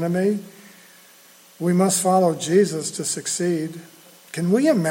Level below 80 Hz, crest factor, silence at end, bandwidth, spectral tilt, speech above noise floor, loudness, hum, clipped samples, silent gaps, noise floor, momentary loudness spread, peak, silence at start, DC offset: -70 dBFS; 16 dB; 0 s; 17 kHz; -5 dB/octave; 30 dB; -21 LUFS; none; under 0.1%; none; -50 dBFS; 11 LU; -6 dBFS; 0 s; under 0.1%